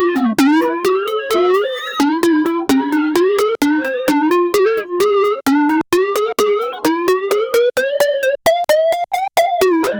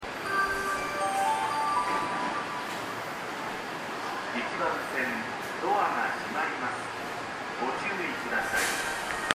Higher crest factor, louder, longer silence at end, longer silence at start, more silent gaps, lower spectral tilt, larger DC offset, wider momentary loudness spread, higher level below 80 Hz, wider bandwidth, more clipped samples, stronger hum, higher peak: second, 12 dB vs 28 dB; first, -15 LUFS vs -30 LUFS; about the same, 0 s vs 0 s; about the same, 0 s vs 0 s; neither; about the same, -3.5 dB/octave vs -2.5 dB/octave; neither; second, 3 LU vs 7 LU; first, -54 dBFS vs -60 dBFS; first, over 20 kHz vs 15.5 kHz; neither; neither; about the same, -2 dBFS vs -4 dBFS